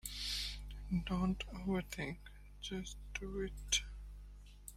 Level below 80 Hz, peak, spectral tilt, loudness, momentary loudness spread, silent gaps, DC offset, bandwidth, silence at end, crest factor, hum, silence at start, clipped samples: -50 dBFS; -20 dBFS; -3.5 dB/octave; -41 LUFS; 18 LU; none; under 0.1%; 16 kHz; 0 s; 22 dB; 50 Hz at -50 dBFS; 0.05 s; under 0.1%